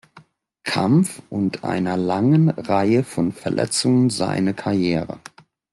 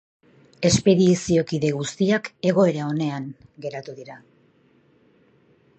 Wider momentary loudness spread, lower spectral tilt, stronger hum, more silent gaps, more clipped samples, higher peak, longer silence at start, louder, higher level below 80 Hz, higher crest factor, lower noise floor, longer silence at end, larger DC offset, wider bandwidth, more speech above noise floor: second, 7 LU vs 19 LU; about the same, -6 dB/octave vs -5.5 dB/octave; neither; neither; neither; about the same, -6 dBFS vs -4 dBFS; second, 0.15 s vs 0.6 s; about the same, -20 LUFS vs -21 LUFS; about the same, -58 dBFS vs -54 dBFS; second, 14 dB vs 20 dB; second, -51 dBFS vs -59 dBFS; second, 0.55 s vs 1.6 s; neither; first, 12.5 kHz vs 9 kHz; second, 32 dB vs 38 dB